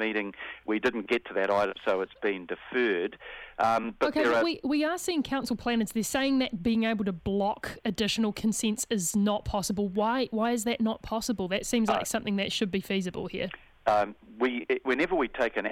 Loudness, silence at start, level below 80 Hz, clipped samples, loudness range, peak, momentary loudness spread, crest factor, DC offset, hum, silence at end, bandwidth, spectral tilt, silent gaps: -29 LUFS; 0 s; -54 dBFS; under 0.1%; 2 LU; -12 dBFS; 6 LU; 18 dB; under 0.1%; none; 0 s; 16 kHz; -4 dB/octave; none